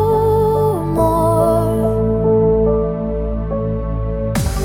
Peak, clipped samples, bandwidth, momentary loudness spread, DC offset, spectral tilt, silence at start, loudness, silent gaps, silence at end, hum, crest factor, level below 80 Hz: -2 dBFS; under 0.1%; 17 kHz; 7 LU; under 0.1%; -8 dB/octave; 0 s; -16 LUFS; none; 0 s; none; 12 dB; -26 dBFS